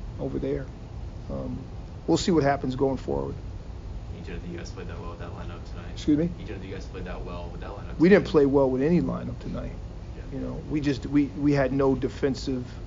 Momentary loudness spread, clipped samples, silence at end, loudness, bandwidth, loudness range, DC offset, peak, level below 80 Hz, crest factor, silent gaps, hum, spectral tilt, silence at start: 17 LU; under 0.1%; 0 s; -26 LUFS; 7.4 kHz; 8 LU; under 0.1%; -4 dBFS; -40 dBFS; 22 dB; none; none; -6.5 dB/octave; 0 s